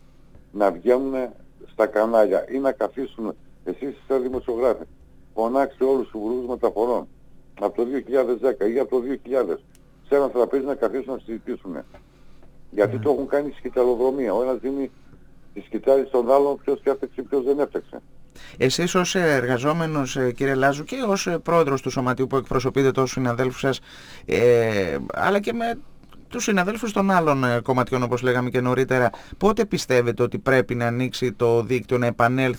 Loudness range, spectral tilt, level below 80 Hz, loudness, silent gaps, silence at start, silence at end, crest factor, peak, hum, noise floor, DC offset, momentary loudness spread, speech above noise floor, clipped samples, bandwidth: 4 LU; -5.5 dB/octave; -48 dBFS; -22 LUFS; none; 0.35 s; 0 s; 18 dB; -4 dBFS; none; -48 dBFS; under 0.1%; 12 LU; 26 dB; under 0.1%; over 20 kHz